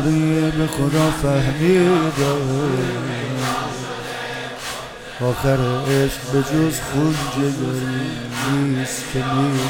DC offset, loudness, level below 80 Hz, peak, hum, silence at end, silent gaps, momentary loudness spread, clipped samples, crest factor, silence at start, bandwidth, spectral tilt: under 0.1%; -20 LUFS; -40 dBFS; -4 dBFS; none; 0 s; none; 10 LU; under 0.1%; 16 dB; 0 s; 18.5 kHz; -5.5 dB/octave